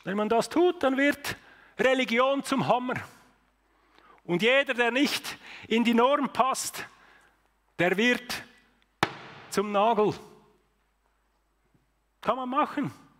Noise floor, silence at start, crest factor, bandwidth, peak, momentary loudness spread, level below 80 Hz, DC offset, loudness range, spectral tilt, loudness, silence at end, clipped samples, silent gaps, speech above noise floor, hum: -71 dBFS; 0.05 s; 20 dB; 16 kHz; -8 dBFS; 15 LU; -66 dBFS; under 0.1%; 5 LU; -4 dB/octave; -26 LUFS; 0.25 s; under 0.1%; none; 45 dB; none